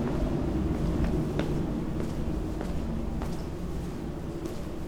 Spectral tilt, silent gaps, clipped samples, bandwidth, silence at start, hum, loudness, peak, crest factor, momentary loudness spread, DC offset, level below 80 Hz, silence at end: -7.5 dB/octave; none; under 0.1%; 19.5 kHz; 0 s; none; -32 LUFS; -12 dBFS; 18 dB; 7 LU; under 0.1%; -36 dBFS; 0 s